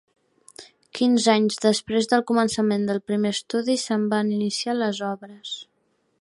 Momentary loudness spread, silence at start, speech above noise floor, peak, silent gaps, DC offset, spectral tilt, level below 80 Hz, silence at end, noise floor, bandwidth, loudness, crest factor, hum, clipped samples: 14 LU; 0.6 s; 26 dB; -6 dBFS; none; under 0.1%; -4.5 dB/octave; -66 dBFS; 0.6 s; -48 dBFS; 11.5 kHz; -22 LUFS; 18 dB; none; under 0.1%